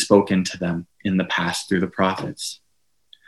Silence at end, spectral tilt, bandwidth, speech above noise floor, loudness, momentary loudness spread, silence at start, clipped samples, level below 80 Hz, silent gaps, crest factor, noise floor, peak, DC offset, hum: 0.75 s; -5 dB/octave; 12.5 kHz; 51 dB; -22 LUFS; 12 LU; 0 s; under 0.1%; -56 dBFS; none; 22 dB; -72 dBFS; 0 dBFS; under 0.1%; none